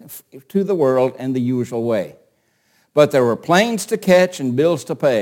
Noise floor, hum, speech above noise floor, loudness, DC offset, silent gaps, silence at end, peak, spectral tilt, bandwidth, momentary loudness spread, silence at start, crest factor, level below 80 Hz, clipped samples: -62 dBFS; none; 45 dB; -17 LUFS; under 0.1%; none; 0 s; 0 dBFS; -5.5 dB/octave; 17 kHz; 8 LU; 0.1 s; 18 dB; -64 dBFS; under 0.1%